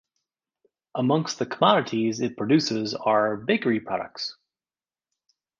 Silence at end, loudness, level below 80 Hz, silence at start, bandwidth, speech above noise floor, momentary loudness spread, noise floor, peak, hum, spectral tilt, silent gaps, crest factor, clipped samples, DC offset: 1.3 s; -24 LUFS; -68 dBFS; 0.95 s; 7.6 kHz; over 66 dB; 11 LU; under -90 dBFS; -4 dBFS; none; -5 dB/octave; none; 22 dB; under 0.1%; under 0.1%